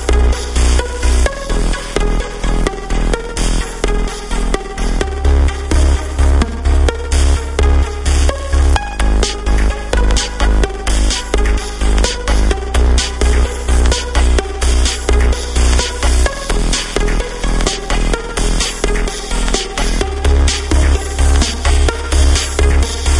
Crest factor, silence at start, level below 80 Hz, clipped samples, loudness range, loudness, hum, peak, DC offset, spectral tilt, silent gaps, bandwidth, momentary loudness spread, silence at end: 12 dB; 0 s; -14 dBFS; under 0.1%; 3 LU; -16 LUFS; none; 0 dBFS; under 0.1%; -4.5 dB/octave; none; 11.5 kHz; 5 LU; 0 s